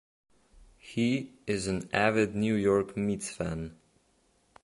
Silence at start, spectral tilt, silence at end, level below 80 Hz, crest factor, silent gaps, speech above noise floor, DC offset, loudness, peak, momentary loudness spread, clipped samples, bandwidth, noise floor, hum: 0.6 s; -5.5 dB/octave; 0.9 s; -56 dBFS; 22 dB; none; 40 dB; under 0.1%; -30 LUFS; -10 dBFS; 9 LU; under 0.1%; 11.5 kHz; -69 dBFS; none